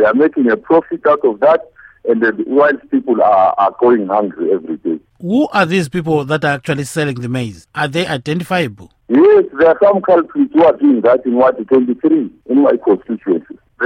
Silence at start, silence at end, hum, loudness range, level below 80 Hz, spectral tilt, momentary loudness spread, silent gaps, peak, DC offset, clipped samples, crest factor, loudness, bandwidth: 0 s; 0 s; none; 5 LU; -54 dBFS; -6.5 dB/octave; 9 LU; none; 0 dBFS; under 0.1%; under 0.1%; 14 dB; -14 LUFS; 15 kHz